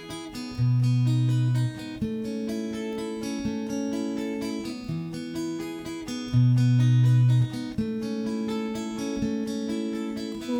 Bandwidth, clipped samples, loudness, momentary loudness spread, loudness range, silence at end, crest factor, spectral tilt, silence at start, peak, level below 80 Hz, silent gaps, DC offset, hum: 12 kHz; under 0.1%; -27 LUFS; 12 LU; 7 LU; 0 s; 14 dB; -7.5 dB/octave; 0 s; -12 dBFS; -54 dBFS; none; under 0.1%; none